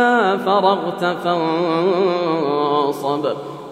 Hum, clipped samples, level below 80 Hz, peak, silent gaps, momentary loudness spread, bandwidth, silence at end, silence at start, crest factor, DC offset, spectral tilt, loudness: none; under 0.1%; -70 dBFS; -2 dBFS; none; 5 LU; 15.5 kHz; 0 s; 0 s; 16 dB; under 0.1%; -6 dB/octave; -18 LUFS